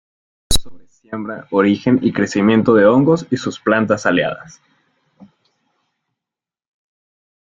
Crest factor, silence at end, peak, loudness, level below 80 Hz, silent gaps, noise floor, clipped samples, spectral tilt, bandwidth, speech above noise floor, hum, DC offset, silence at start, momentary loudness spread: 16 dB; 3.1 s; -2 dBFS; -16 LUFS; -36 dBFS; none; -87 dBFS; under 0.1%; -5.5 dB/octave; 16.5 kHz; 72 dB; none; under 0.1%; 0.5 s; 16 LU